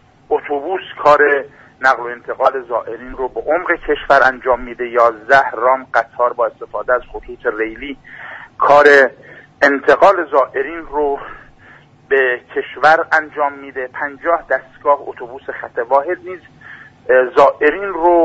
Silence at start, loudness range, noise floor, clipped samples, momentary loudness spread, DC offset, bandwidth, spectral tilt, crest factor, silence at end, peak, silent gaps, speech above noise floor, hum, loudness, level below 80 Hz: 0.3 s; 5 LU; -44 dBFS; under 0.1%; 16 LU; under 0.1%; 8 kHz; -4.5 dB/octave; 16 dB; 0 s; 0 dBFS; none; 29 dB; none; -15 LUFS; -46 dBFS